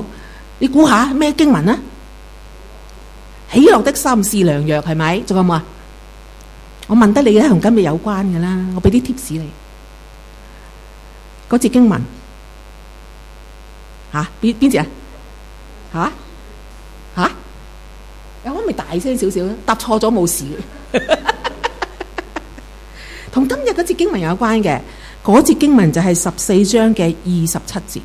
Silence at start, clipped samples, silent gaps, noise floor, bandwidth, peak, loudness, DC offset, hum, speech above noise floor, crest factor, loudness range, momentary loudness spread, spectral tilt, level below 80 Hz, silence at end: 0 s; under 0.1%; none; -37 dBFS; 16 kHz; 0 dBFS; -14 LUFS; under 0.1%; none; 23 dB; 16 dB; 8 LU; 17 LU; -5.5 dB/octave; -36 dBFS; 0 s